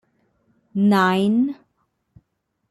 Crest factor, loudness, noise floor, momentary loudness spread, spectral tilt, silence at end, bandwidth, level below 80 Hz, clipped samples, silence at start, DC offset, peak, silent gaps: 18 dB; -19 LUFS; -73 dBFS; 14 LU; -7 dB/octave; 1.15 s; 12.5 kHz; -66 dBFS; under 0.1%; 0.75 s; under 0.1%; -6 dBFS; none